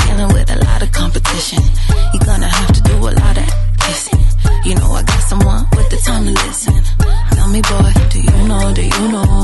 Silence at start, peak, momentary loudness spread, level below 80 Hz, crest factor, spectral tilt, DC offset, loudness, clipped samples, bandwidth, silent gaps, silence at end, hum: 0 s; 0 dBFS; 3 LU; -12 dBFS; 10 dB; -5 dB/octave; under 0.1%; -13 LUFS; under 0.1%; 12 kHz; none; 0 s; none